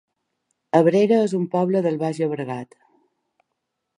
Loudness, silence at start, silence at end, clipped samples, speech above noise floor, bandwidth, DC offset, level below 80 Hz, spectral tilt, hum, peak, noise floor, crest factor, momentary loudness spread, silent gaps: -20 LUFS; 0.75 s; 1.35 s; under 0.1%; 59 dB; 11 kHz; under 0.1%; -72 dBFS; -7.5 dB/octave; none; -2 dBFS; -79 dBFS; 20 dB; 12 LU; none